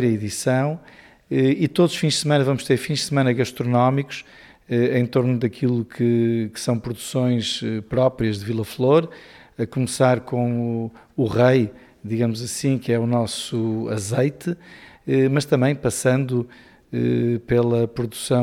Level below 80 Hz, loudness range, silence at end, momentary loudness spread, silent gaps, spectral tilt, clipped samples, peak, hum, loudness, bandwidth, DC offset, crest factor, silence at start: -52 dBFS; 2 LU; 0 s; 9 LU; none; -6 dB/octave; under 0.1%; -4 dBFS; none; -21 LUFS; 15.5 kHz; under 0.1%; 16 dB; 0 s